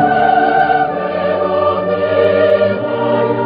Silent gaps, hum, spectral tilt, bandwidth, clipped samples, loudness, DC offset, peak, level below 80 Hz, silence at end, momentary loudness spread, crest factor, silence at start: none; none; -9 dB/octave; 5.2 kHz; under 0.1%; -13 LUFS; under 0.1%; -2 dBFS; -48 dBFS; 0 s; 5 LU; 12 dB; 0 s